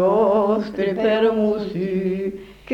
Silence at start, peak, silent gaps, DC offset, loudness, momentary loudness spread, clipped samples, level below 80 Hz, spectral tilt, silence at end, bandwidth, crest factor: 0 s; -6 dBFS; none; under 0.1%; -20 LUFS; 9 LU; under 0.1%; -52 dBFS; -8 dB/octave; 0 s; 7.4 kHz; 14 dB